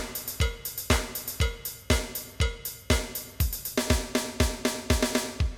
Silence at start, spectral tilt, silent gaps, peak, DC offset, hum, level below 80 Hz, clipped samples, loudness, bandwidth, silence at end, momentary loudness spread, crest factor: 0 s; -4 dB/octave; none; -10 dBFS; under 0.1%; none; -34 dBFS; under 0.1%; -29 LUFS; 19 kHz; 0 s; 7 LU; 18 dB